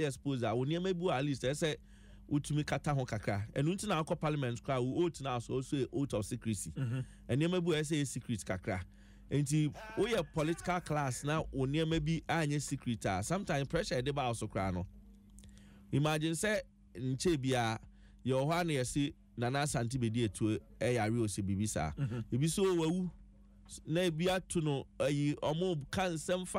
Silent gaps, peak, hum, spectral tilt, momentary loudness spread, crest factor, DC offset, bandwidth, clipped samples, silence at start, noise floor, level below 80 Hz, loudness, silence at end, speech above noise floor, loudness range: none; -20 dBFS; none; -5.5 dB/octave; 6 LU; 14 dB; under 0.1%; 16 kHz; under 0.1%; 0 s; -58 dBFS; -56 dBFS; -35 LUFS; 0 s; 24 dB; 2 LU